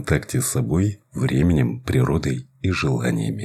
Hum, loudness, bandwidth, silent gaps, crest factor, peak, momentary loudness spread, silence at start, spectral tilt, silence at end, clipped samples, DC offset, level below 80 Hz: none; -22 LUFS; 14.5 kHz; none; 18 dB; -4 dBFS; 6 LU; 0 s; -6 dB/octave; 0 s; under 0.1%; under 0.1%; -38 dBFS